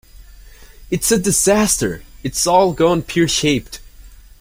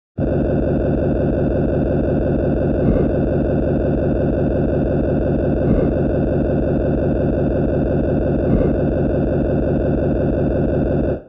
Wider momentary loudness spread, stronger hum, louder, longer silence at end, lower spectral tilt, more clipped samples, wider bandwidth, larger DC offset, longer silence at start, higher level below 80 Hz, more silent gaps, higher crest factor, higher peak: first, 11 LU vs 2 LU; neither; about the same, -16 LUFS vs -18 LUFS; first, 0.25 s vs 0 s; second, -3.5 dB/octave vs -12 dB/octave; neither; first, 16.5 kHz vs 4.9 kHz; second, under 0.1% vs 0.3%; about the same, 0.15 s vs 0.15 s; second, -38 dBFS vs -26 dBFS; neither; first, 18 dB vs 12 dB; first, 0 dBFS vs -4 dBFS